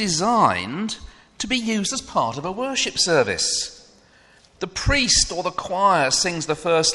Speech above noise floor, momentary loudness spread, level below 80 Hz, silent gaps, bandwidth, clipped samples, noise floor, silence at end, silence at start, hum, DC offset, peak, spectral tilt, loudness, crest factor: 32 dB; 12 LU; -40 dBFS; none; 11.5 kHz; under 0.1%; -53 dBFS; 0 s; 0 s; none; under 0.1%; -4 dBFS; -2.5 dB/octave; -20 LUFS; 18 dB